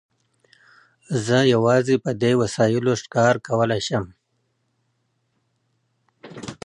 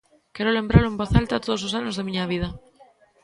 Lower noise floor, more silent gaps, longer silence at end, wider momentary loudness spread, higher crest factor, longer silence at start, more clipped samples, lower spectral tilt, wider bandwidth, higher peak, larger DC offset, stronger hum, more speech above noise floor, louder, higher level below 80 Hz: first, -71 dBFS vs -55 dBFS; neither; second, 0.1 s vs 0.65 s; about the same, 10 LU vs 8 LU; about the same, 18 dB vs 22 dB; first, 1.1 s vs 0.35 s; neither; about the same, -5.5 dB/octave vs -6.5 dB/octave; about the same, 11 kHz vs 11 kHz; about the same, -4 dBFS vs -2 dBFS; neither; neither; first, 51 dB vs 33 dB; first, -20 LUFS vs -23 LUFS; second, -58 dBFS vs -36 dBFS